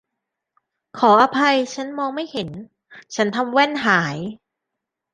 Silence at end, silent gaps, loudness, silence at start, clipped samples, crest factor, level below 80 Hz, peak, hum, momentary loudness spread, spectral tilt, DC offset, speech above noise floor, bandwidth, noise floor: 0.75 s; none; -19 LUFS; 0.95 s; under 0.1%; 20 dB; -64 dBFS; -2 dBFS; none; 18 LU; -4.5 dB/octave; under 0.1%; 63 dB; 9.8 kHz; -82 dBFS